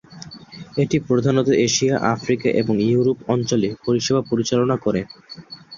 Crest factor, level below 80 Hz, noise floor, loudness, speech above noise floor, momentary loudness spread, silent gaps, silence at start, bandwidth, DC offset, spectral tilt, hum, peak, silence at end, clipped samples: 18 dB; -54 dBFS; -40 dBFS; -20 LUFS; 21 dB; 20 LU; none; 0.1 s; 7.4 kHz; under 0.1%; -5.5 dB/octave; none; -2 dBFS; 0 s; under 0.1%